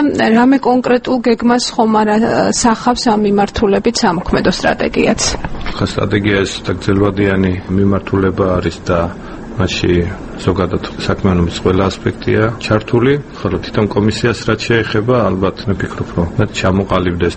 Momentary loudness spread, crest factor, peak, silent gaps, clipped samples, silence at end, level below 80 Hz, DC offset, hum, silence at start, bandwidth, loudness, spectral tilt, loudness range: 7 LU; 14 dB; 0 dBFS; none; under 0.1%; 0 s; -32 dBFS; under 0.1%; none; 0 s; 8.8 kHz; -14 LUFS; -5.5 dB/octave; 3 LU